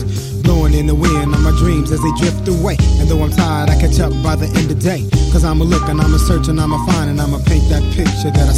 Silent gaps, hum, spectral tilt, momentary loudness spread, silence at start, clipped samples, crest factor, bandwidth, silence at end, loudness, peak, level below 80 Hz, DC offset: none; none; -6.5 dB/octave; 3 LU; 0 s; under 0.1%; 12 dB; 15 kHz; 0 s; -14 LUFS; 0 dBFS; -16 dBFS; under 0.1%